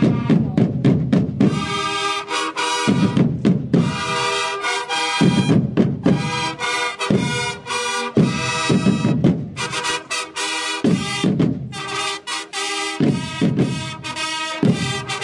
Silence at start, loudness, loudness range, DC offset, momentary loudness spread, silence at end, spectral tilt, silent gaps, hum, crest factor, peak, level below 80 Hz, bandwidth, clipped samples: 0 s; -19 LUFS; 3 LU; under 0.1%; 6 LU; 0 s; -5 dB/octave; none; none; 16 dB; -4 dBFS; -52 dBFS; 11.5 kHz; under 0.1%